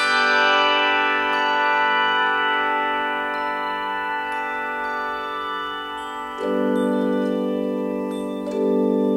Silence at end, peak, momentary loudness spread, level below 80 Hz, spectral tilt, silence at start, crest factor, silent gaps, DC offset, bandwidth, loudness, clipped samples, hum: 0 s; -6 dBFS; 10 LU; -58 dBFS; -4.5 dB/octave; 0 s; 16 dB; none; under 0.1%; 16 kHz; -21 LUFS; under 0.1%; none